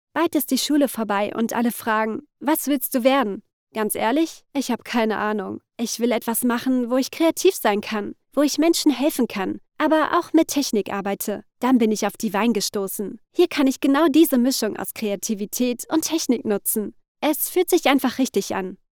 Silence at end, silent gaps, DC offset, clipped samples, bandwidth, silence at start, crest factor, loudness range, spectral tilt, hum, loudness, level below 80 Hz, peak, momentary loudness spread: 0.15 s; 3.53-3.67 s, 17.08-17.15 s; under 0.1%; under 0.1%; over 20 kHz; 0.15 s; 18 dB; 3 LU; -3.5 dB/octave; none; -21 LUFS; -62 dBFS; -4 dBFS; 9 LU